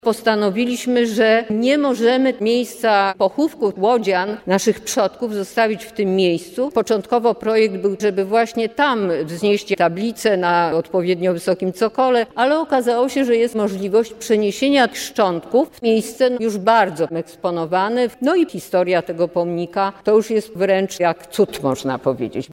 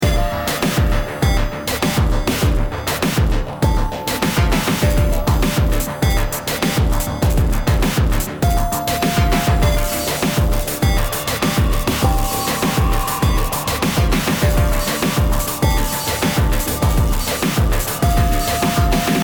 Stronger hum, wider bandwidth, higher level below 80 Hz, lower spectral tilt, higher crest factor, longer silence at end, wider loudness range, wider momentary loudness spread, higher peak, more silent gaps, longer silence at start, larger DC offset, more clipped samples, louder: neither; second, 16.5 kHz vs over 20 kHz; second, -60 dBFS vs -20 dBFS; about the same, -5 dB/octave vs -5 dB/octave; about the same, 14 dB vs 14 dB; about the same, 0 s vs 0 s; about the same, 2 LU vs 1 LU; about the same, 5 LU vs 3 LU; about the same, -4 dBFS vs -2 dBFS; neither; about the same, 0.05 s vs 0 s; neither; neither; about the same, -18 LUFS vs -18 LUFS